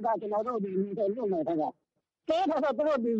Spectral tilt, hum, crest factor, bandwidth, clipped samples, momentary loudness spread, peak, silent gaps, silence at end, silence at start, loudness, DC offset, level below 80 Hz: -7.5 dB/octave; none; 12 dB; 8 kHz; under 0.1%; 5 LU; -16 dBFS; none; 0 s; 0 s; -30 LUFS; under 0.1%; -72 dBFS